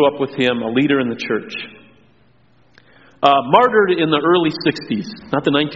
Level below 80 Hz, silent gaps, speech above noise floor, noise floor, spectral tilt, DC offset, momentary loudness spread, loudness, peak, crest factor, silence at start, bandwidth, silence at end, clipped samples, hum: -58 dBFS; none; 39 dB; -55 dBFS; -3.5 dB/octave; 0.2%; 12 LU; -16 LUFS; 0 dBFS; 18 dB; 0 s; 7.6 kHz; 0 s; under 0.1%; none